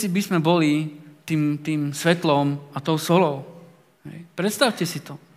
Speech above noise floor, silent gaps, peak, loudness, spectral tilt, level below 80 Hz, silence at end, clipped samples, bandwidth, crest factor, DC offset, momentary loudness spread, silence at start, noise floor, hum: 27 dB; none; -2 dBFS; -22 LUFS; -5.5 dB/octave; -74 dBFS; 0.2 s; under 0.1%; 16 kHz; 20 dB; under 0.1%; 15 LU; 0 s; -49 dBFS; none